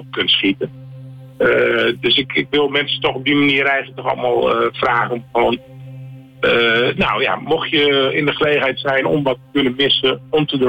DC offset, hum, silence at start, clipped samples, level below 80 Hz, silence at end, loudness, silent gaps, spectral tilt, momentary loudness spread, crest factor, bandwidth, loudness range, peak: under 0.1%; none; 0 s; under 0.1%; -50 dBFS; 0 s; -16 LUFS; none; -6.5 dB/octave; 9 LU; 10 dB; 17 kHz; 2 LU; -6 dBFS